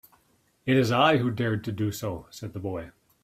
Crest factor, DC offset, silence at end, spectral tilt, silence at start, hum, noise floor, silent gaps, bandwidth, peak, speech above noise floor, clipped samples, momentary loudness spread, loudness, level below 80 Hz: 20 dB; under 0.1%; 0.35 s; -6 dB/octave; 0.65 s; none; -67 dBFS; none; 16 kHz; -6 dBFS; 41 dB; under 0.1%; 17 LU; -26 LUFS; -60 dBFS